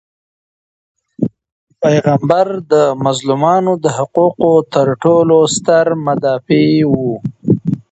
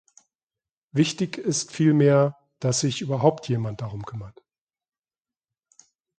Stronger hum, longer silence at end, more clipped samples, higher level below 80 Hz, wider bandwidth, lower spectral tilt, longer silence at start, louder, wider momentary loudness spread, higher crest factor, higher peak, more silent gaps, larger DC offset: neither; second, 0.15 s vs 1.9 s; neither; first, -50 dBFS vs -60 dBFS; about the same, 8.8 kHz vs 9.4 kHz; about the same, -6 dB/octave vs -5.5 dB/octave; first, 1.2 s vs 0.95 s; first, -13 LUFS vs -23 LUFS; second, 6 LU vs 16 LU; second, 14 dB vs 22 dB; first, 0 dBFS vs -4 dBFS; first, 1.52-1.67 s vs none; neither